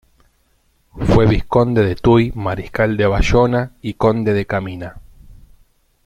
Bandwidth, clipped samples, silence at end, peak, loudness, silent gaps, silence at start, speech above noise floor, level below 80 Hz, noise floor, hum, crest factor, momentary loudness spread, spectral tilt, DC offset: 11 kHz; under 0.1%; 0.7 s; -2 dBFS; -16 LUFS; none; 0.95 s; 44 dB; -30 dBFS; -60 dBFS; none; 16 dB; 10 LU; -7.5 dB/octave; under 0.1%